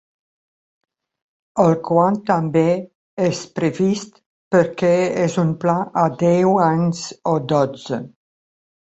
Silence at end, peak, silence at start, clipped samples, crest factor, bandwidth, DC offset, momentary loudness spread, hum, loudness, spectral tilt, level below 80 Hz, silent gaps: 0.85 s; -2 dBFS; 1.55 s; under 0.1%; 18 dB; 8.2 kHz; under 0.1%; 10 LU; none; -19 LUFS; -7 dB/octave; -60 dBFS; 2.95-3.17 s, 4.26-4.51 s